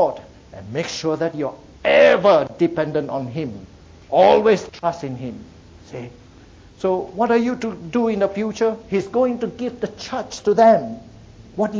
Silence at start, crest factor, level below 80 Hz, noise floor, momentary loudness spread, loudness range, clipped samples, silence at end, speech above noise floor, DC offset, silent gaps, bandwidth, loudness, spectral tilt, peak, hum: 0 s; 16 dB; -50 dBFS; -45 dBFS; 21 LU; 6 LU; under 0.1%; 0 s; 26 dB; under 0.1%; none; 7.8 kHz; -19 LUFS; -5.5 dB/octave; -4 dBFS; none